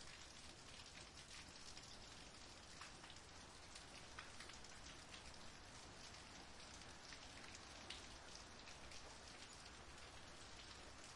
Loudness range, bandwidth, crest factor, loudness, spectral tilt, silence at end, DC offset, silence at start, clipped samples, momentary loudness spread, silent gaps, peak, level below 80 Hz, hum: 1 LU; 12 kHz; 20 dB; -57 LUFS; -2 dB/octave; 0 s; under 0.1%; 0 s; under 0.1%; 2 LU; none; -38 dBFS; -70 dBFS; none